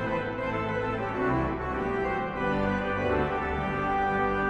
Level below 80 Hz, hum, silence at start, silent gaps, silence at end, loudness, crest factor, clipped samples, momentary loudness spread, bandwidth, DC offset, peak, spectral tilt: -42 dBFS; none; 0 s; none; 0 s; -29 LUFS; 14 dB; under 0.1%; 4 LU; 8.8 kHz; under 0.1%; -14 dBFS; -7.5 dB/octave